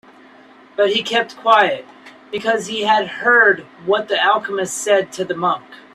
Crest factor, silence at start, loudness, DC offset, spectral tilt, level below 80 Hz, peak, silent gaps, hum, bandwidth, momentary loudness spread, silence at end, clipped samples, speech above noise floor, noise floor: 16 dB; 0.8 s; -17 LUFS; under 0.1%; -2.5 dB/octave; -66 dBFS; -2 dBFS; none; none; 14 kHz; 11 LU; 0.2 s; under 0.1%; 28 dB; -45 dBFS